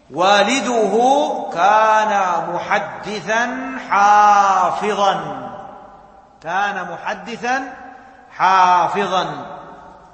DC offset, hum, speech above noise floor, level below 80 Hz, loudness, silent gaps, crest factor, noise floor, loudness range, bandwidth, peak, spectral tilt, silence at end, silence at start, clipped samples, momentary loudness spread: under 0.1%; none; 28 dB; -58 dBFS; -16 LUFS; none; 16 dB; -44 dBFS; 7 LU; 8.8 kHz; 0 dBFS; -3.5 dB/octave; 0.2 s; 0.1 s; under 0.1%; 17 LU